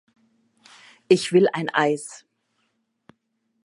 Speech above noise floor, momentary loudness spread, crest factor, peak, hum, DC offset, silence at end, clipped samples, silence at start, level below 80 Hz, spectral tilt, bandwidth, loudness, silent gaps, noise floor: 52 dB; 11 LU; 22 dB; -2 dBFS; none; under 0.1%; 1.5 s; under 0.1%; 1.1 s; -78 dBFS; -5 dB/octave; 11.5 kHz; -21 LUFS; none; -73 dBFS